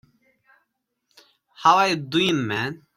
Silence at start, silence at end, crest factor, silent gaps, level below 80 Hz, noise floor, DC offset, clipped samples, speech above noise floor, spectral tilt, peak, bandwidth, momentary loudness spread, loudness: 1.6 s; 0.2 s; 20 dB; none; -66 dBFS; -76 dBFS; under 0.1%; under 0.1%; 55 dB; -4.5 dB/octave; -4 dBFS; 15.5 kHz; 8 LU; -21 LUFS